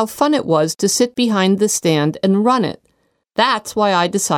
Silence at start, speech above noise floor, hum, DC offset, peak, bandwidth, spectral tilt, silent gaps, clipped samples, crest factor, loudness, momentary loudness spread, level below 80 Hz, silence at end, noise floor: 0 s; 48 dB; none; under 0.1%; -2 dBFS; 18 kHz; -4 dB/octave; none; under 0.1%; 14 dB; -16 LUFS; 2 LU; -60 dBFS; 0 s; -64 dBFS